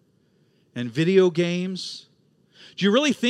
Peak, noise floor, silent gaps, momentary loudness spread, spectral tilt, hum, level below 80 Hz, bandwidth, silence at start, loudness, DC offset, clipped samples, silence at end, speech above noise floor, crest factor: -6 dBFS; -63 dBFS; none; 20 LU; -5.5 dB/octave; none; -76 dBFS; 11.5 kHz; 0.75 s; -22 LUFS; under 0.1%; under 0.1%; 0 s; 41 dB; 18 dB